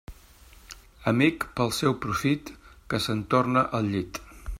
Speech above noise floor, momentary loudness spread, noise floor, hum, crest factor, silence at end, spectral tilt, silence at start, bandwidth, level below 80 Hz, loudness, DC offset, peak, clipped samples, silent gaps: 27 dB; 19 LU; -52 dBFS; none; 20 dB; 0 s; -5.5 dB/octave; 0.1 s; 16 kHz; -48 dBFS; -26 LUFS; under 0.1%; -8 dBFS; under 0.1%; none